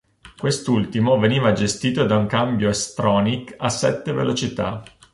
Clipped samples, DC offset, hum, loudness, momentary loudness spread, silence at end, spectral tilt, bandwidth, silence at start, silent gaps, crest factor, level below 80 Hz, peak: under 0.1%; under 0.1%; none; -20 LUFS; 7 LU; 0.3 s; -5 dB/octave; 11.5 kHz; 0.25 s; none; 16 dB; -48 dBFS; -4 dBFS